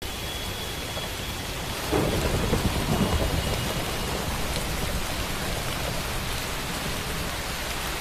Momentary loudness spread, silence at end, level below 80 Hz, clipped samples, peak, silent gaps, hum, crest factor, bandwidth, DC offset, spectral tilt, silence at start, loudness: 6 LU; 0 s; -34 dBFS; under 0.1%; -10 dBFS; none; none; 18 dB; 16 kHz; under 0.1%; -4 dB/octave; 0 s; -28 LUFS